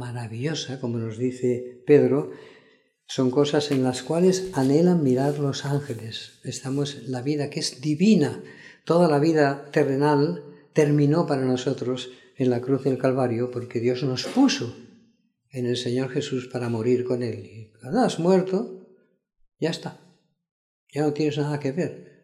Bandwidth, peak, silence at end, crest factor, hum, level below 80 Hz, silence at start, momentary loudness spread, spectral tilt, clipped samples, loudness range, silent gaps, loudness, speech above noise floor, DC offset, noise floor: 13.5 kHz; -4 dBFS; 0.2 s; 20 dB; none; -68 dBFS; 0 s; 14 LU; -6.5 dB/octave; under 0.1%; 5 LU; 20.51-20.87 s; -24 LUFS; 41 dB; under 0.1%; -64 dBFS